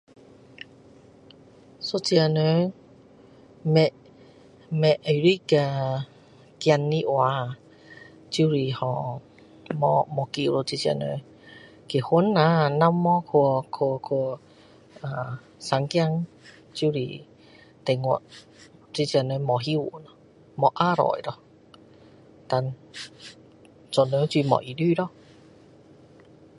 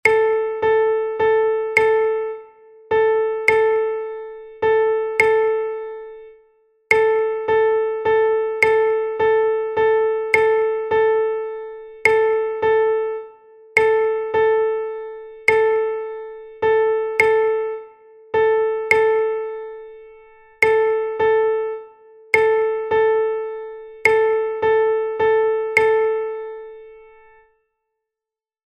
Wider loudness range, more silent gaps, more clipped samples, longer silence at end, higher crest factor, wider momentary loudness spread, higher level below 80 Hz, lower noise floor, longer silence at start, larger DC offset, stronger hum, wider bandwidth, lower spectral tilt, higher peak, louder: first, 6 LU vs 3 LU; neither; neither; second, 1.5 s vs 1.8 s; about the same, 22 dB vs 18 dB; first, 17 LU vs 14 LU; second, -66 dBFS vs -58 dBFS; second, -52 dBFS vs -89 dBFS; first, 1.8 s vs 0.05 s; neither; neither; first, 11 kHz vs 9.2 kHz; first, -6.5 dB/octave vs -4 dB/octave; second, -4 dBFS vs 0 dBFS; second, -24 LUFS vs -18 LUFS